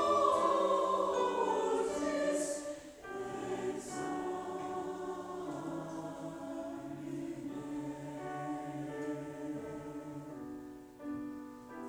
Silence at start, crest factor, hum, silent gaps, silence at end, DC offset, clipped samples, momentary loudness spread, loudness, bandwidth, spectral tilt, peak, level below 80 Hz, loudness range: 0 s; 18 dB; none; none; 0 s; under 0.1%; under 0.1%; 15 LU; -37 LUFS; over 20 kHz; -5 dB/octave; -18 dBFS; -68 dBFS; 9 LU